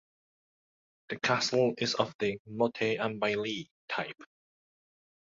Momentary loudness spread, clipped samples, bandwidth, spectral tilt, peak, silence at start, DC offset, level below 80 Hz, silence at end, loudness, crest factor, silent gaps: 11 LU; under 0.1%; 7.8 kHz; -4 dB/octave; -10 dBFS; 1.1 s; under 0.1%; -72 dBFS; 1.05 s; -31 LUFS; 22 dB; 2.15-2.19 s, 2.39-2.45 s, 3.71-3.88 s